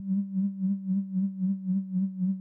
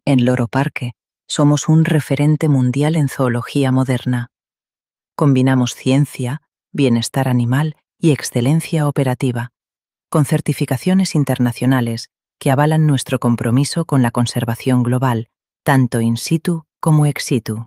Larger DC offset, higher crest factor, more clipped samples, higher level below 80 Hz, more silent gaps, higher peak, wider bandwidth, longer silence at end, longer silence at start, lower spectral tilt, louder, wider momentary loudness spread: neither; second, 8 dB vs 14 dB; neither; second, under -90 dBFS vs -56 dBFS; neither; second, -22 dBFS vs -2 dBFS; second, 1 kHz vs 15.5 kHz; about the same, 0 s vs 0 s; about the same, 0 s vs 0.05 s; first, -14.5 dB/octave vs -6.5 dB/octave; second, -30 LUFS vs -17 LUFS; second, 2 LU vs 9 LU